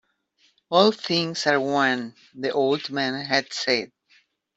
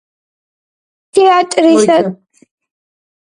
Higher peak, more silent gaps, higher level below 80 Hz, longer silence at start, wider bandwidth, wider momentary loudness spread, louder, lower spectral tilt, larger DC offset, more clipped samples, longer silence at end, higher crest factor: second, -4 dBFS vs 0 dBFS; neither; second, -70 dBFS vs -62 dBFS; second, 0.7 s vs 1.15 s; second, 8.2 kHz vs 11 kHz; about the same, 9 LU vs 7 LU; second, -23 LUFS vs -11 LUFS; about the same, -4 dB/octave vs -4.5 dB/octave; neither; neither; second, 0.7 s vs 1.2 s; first, 20 dB vs 14 dB